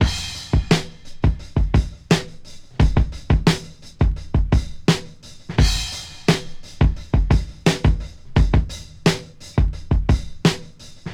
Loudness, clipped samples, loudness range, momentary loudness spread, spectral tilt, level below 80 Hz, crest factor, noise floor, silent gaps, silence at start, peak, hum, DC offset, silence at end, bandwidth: -21 LUFS; under 0.1%; 1 LU; 10 LU; -5.5 dB/octave; -24 dBFS; 18 dB; -38 dBFS; none; 0 s; -2 dBFS; none; under 0.1%; 0 s; 14 kHz